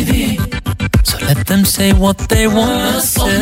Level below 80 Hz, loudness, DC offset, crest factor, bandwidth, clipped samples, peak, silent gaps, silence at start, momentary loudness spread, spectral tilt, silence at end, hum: -20 dBFS; -13 LUFS; under 0.1%; 12 dB; 16.5 kHz; under 0.1%; 0 dBFS; none; 0 s; 6 LU; -4.5 dB/octave; 0 s; none